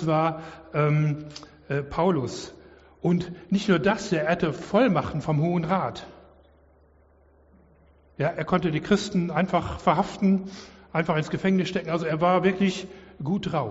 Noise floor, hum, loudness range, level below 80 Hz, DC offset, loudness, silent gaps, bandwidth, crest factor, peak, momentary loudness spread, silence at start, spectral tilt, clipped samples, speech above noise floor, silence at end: -58 dBFS; none; 5 LU; -52 dBFS; under 0.1%; -25 LUFS; none; 8 kHz; 18 dB; -6 dBFS; 12 LU; 0 s; -6 dB/octave; under 0.1%; 34 dB; 0 s